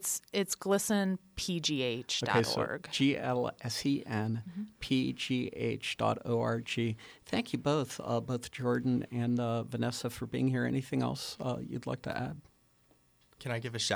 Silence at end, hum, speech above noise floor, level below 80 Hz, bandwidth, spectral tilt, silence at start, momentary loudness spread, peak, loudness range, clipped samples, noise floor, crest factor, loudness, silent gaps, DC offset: 0 s; none; 35 dB; -62 dBFS; over 20 kHz; -4.5 dB/octave; 0 s; 8 LU; -14 dBFS; 4 LU; under 0.1%; -68 dBFS; 20 dB; -33 LUFS; none; under 0.1%